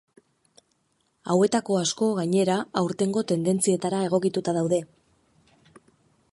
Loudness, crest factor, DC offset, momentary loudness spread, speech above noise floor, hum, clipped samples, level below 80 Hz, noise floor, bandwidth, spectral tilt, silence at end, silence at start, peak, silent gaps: -24 LUFS; 20 dB; under 0.1%; 4 LU; 47 dB; none; under 0.1%; -68 dBFS; -71 dBFS; 11.5 kHz; -5.5 dB/octave; 1.5 s; 1.25 s; -6 dBFS; none